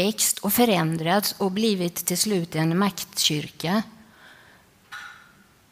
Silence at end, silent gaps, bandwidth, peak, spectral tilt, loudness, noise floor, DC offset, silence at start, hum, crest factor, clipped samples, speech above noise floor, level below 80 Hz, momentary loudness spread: 0.55 s; none; 16 kHz; -6 dBFS; -3.5 dB/octave; -23 LUFS; -55 dBFS; under 0.1%; 0 s; none; 20 dB; under 0.1%; 31 dB; -64 dBFS; 19 LU